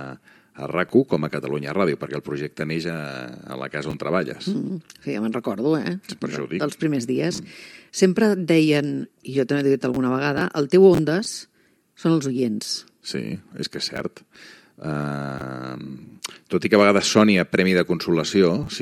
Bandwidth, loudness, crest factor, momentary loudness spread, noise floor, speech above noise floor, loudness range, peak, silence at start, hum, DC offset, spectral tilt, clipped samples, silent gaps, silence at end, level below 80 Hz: 14 kHz; -22 LUFS; 20 dB; 16 LU; -60 dBFS; 38 dB; 8 LU; -2 dBFS; 0 s; none; under 0.1%; -5.5 dB/octave; under 0.1%; none; 0 s; -58 dBFS